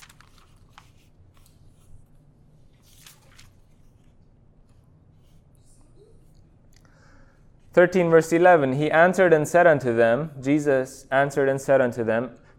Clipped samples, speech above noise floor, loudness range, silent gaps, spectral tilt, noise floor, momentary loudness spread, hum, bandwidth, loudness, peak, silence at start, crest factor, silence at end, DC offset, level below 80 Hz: under 0.1%; 35 dB; 6 LU; none; -6 dB/octave; -55 dBFS; 8 LU; none; 15 kHz; -20 LUFS; -4 dBFS; 7.75 s; 20 dB; 0.3 s; under 0.1%; -56 dBFS